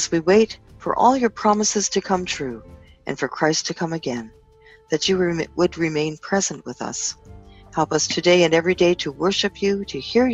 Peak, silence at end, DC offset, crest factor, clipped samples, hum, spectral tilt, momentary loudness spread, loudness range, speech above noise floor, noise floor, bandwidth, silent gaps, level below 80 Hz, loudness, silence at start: -2 dBFS; 0 s; under 0.1%; 18 dB; under 0.1%; none; -3.5 dB/octave; 12 LU; 4 LU; 30 dB; -51 dBFS; 8.4 kHz; none; -50 dBFS; -21 LUFS; 0 s